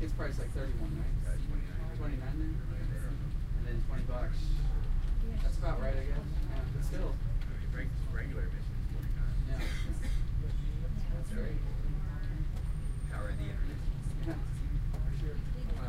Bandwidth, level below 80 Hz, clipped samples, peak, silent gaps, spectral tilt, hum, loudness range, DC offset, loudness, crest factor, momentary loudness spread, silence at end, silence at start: 11.5 kHz; -34 dBFS; under 0.1%; -20 dBFS; none; -7 dB/octave; none; 2 LU; under 0.1%; -38 LUFS; 14 dB; 3 LU; 0 s; 0 s